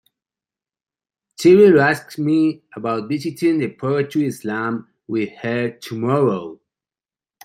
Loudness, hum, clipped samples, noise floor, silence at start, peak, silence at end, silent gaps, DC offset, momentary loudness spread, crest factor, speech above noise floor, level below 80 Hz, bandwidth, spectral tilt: -18 LUFS; none; under 0.1%; under -90 dBFS; 1.4 s; -2 dBFS; 0.9 s; none; under 0.1%; 14 LU; 18 dB; over 72 dB; -62 dBFS; 15.5 kHz; -7 dB/octave